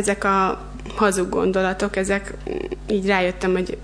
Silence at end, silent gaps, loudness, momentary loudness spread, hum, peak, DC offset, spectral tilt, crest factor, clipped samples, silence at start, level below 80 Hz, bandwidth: 0 s; none; -21 LUFS; 10 LU; none; -4 dBFS; under 0.1%; -5 dB/octave; 18 dB; under 0.1%; 0 s; -38 dBFS; 11 kHz